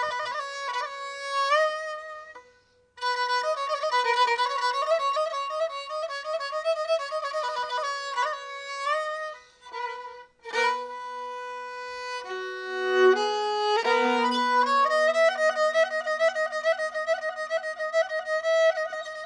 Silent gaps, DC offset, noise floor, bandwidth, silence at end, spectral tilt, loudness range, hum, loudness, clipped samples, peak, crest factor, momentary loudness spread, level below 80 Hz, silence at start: none; under 0.1%; -61 dBFS; 10 kHz; 0 s; -1 dB/octave; 8 LU; none; -26 LUFS; under 0.1%; -10 dBFS; 16 dB; 14 LU; -74 dBFS; 0 s